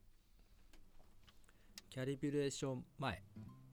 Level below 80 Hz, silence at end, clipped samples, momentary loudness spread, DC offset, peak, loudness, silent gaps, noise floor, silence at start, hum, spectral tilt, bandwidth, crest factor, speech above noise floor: -66 dBFS; 0 s; under 0.1%; 18 LU; under 0.1%; -26 dBFS; -44 LUFS; none; -66 dBFS; 0.05 s; none; -5.5 dB/octave; 18.5 kHz; 20 dB; 23 dB